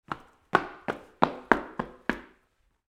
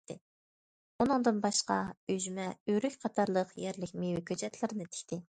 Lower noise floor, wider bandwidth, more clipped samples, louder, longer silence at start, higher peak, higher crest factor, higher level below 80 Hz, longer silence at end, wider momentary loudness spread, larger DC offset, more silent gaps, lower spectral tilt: second, -70 dBFS vs under -90 dBFS; first, 15.5 kHz vs 10.5 kHz; neither; first, -29 LUFS vs -34 LUFS; about the same, 0.1 s vs 0.1 s; first, 0 dBFS vs -14 dBFS; first, 32 dB vs 20 dB; first, -56 dBFS vs -68 dBFS; first, 0.65 s vs 0.1 s; first, 14 LU vs 11 LU; neither; second, none vs 0.21-0.99 s, 1.97-2.07 s, 2.60-2.66 s; first, -6 dB/octave vs -4.5 dB/octave